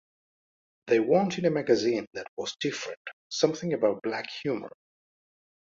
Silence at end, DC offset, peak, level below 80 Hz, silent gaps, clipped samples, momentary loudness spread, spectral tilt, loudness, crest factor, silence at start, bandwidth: 1.1 s; under 0.1%; -8 dBFS; -72 dBFS; 2.07-2.11 s, 2.28-2.37 s, 2.97-3.05 s, 3.13-3.30 s; under 0.1%; 12 LU; -5 dB/octave; -28 LUFS; 20 dB; 0.85 s; 7.8 kHz